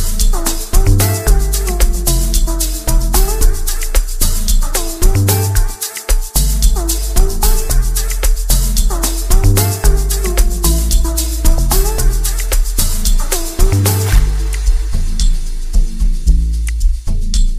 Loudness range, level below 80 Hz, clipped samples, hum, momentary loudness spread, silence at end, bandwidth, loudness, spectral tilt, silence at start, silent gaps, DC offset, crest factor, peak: 2 LU; -12 dBFS; under 0.1%; none; 6 LU; 0 s; 15.5 kHz; -16 LUFS; -4 dB/octave; 0 s; none; 0.5%; 12 dB; 0 dBFS